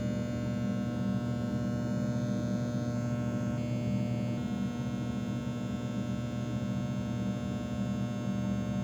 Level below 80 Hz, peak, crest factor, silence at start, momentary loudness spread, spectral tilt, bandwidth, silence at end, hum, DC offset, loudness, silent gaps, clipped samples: -54 dBFS; -22 dBFS; 10 dB; 0 s; 3 LU; -7.5 dB/octave; 11 kHz; 0 s; none; under 0.1%; -34 LUFS; none; under 0.1%